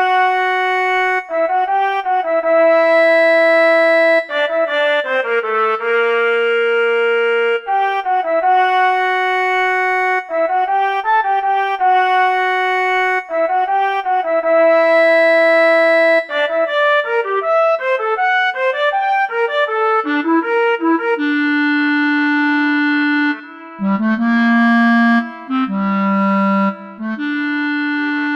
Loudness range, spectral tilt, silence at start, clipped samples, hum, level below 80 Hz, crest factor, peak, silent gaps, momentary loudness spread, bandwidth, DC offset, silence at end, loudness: 3 LU; -6 dB/octave; 0 s; under 0.1%; none; -58 dBFS; 10 dB; -4 dBFS; none; 6 LU; 9.4 kHz; under 0.1%; 0 s; -14 LUFS